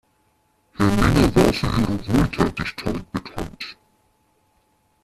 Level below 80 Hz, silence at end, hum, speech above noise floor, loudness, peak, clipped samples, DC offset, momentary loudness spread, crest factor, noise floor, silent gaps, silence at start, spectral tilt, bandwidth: -34 dBFS; 1.3 s; none; 44 dB; -21 LUFS; -2 dBFS; under 0.1%; under 0.1%; 16 LU; 20 dB; -64 dBFS; none; 0.8 s; -6 dB/octave; 14.5 kHz